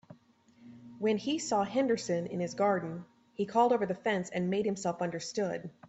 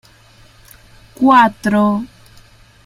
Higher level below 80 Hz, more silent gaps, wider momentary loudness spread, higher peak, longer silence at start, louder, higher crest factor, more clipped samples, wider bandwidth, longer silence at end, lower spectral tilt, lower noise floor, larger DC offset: second, -74 dBFS vs -50 dBFS; neither; second, 8 LU vs 12 LU; second, -14 dBFS vs 0 dBFS; second, 0.1 s vs 1.2 s; second, -32 LUFS vs -13 LUFS; about the same, 18 dB vs 16 dB; neither; second, 8.2 kHz vs 15 kHz; second, 0 s vs 0.8 s; second, -5 dB/octave vs -6.5 dB/octave; first, -63 dBFS vs -46 dBFS; neither